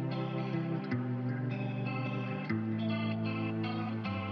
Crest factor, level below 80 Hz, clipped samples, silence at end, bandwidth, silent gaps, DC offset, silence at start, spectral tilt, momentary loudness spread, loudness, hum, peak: 12 dB; -82 dBFS; under 0.1%; 0 s; 6 kHz; none; under 0.1%; 0 s; -9.5 dB/octave; 2 LU; -35 LUFS; none; -22 dBFS